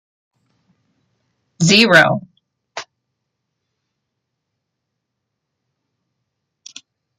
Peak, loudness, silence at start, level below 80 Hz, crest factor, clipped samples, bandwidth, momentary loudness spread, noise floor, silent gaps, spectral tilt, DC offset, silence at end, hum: 0 dBFS; -12 LUFS; 1.6 s; -60 dBFS; 22 dB; under 0.1%; 12.5 kHz; 24 LU; -77 dBFS; none; -3.5 dB/octave; under 0.1%; 4.35 s; none